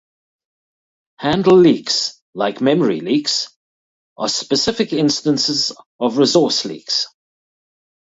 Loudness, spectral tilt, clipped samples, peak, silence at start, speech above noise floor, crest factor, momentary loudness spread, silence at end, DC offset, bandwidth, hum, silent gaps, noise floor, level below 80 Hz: -17 LUFS; -4 dB/octave; under 0.1%; 0 dBFS; 1.2 s; over 74 dB; 18 dB; 10 LU; 1.05 s; under 0.1%; 8 kHz; none; 2.21-2.33 s, 3.56-4.16 s, 5.86-5.99 s; under -90 dBFS; -56 dBFS